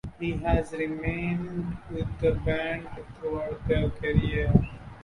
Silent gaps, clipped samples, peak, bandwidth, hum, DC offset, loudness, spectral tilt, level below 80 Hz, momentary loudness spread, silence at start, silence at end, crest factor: none; under 0.1%; -4 dBFS; 11 kHz; none; under 0.1%; -29 LUFS; -8.5 dB/octave; -36 dBFS; 10 LU; 0.05 s; 0 s; 24 dB